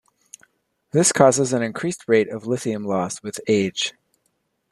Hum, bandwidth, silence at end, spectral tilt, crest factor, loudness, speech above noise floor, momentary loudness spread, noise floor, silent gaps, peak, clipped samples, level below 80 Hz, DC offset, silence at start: none; 13 kHz; 0.8 s; -4 dB/octave; 20 dB; -21 LUFS; 51 dB; 11 LU; -71 dBFS; none; -2 dBFS; under 0.1%; -64 dBFS; under 0.1%; 0.95 s